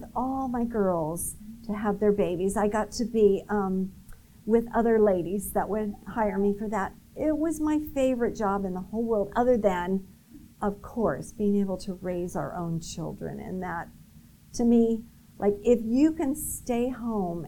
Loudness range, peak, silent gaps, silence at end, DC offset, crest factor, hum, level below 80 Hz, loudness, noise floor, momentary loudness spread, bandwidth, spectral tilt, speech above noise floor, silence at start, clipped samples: 5 LU; -10 dBFS; none; 0 s; 0.1%; 18 dB; none; -48 dBFS; -27 LUFS; -53 dBFS; 11 LU; 18 kHz; -6.5 dB/octave; 26 dB; 0 s; under 0.1%